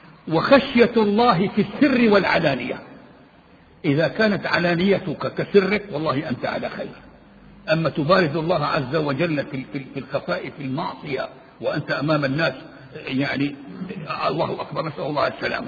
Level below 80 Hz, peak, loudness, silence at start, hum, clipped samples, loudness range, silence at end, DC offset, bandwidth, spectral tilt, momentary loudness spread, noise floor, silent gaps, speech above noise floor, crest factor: -54 dBFS; -2 dBFS; -21 LUFS; 0 s; none; under 0.1%; 6 LU; 0 s; under 0.1%; 7 kHz; -8 dB/octave; 13 LU; -51 dBFS; none; 29 dB; 20 dB